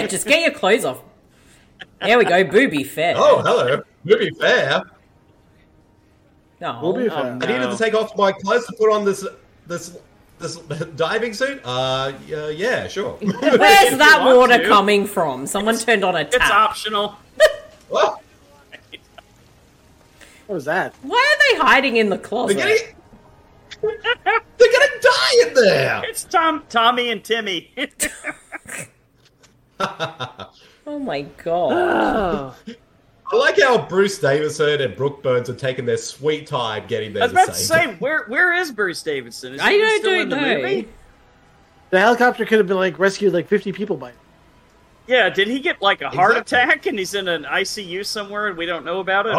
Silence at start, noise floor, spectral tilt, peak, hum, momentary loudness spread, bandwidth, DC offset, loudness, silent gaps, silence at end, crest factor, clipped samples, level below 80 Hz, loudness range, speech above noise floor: 0 s; -56 dBFS; -3.5 dB/octave; -2 dBFS; none; 14 LU; 16.5 kHz; under 0.1%; -17 LUFS; none; 0 s; 18 dB; under 0.1%; -52 dBFS; 10 LU; 38 dB